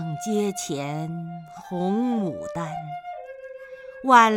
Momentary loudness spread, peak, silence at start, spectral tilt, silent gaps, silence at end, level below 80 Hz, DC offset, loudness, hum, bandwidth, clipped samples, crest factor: 16 LU; -2 dBFS; 0 s; -5 dB/octave; none; 0 s; -64 dBFS; under 0.1%; -25 LUFS; none; 17 kHz; under 0.1%; 22 dB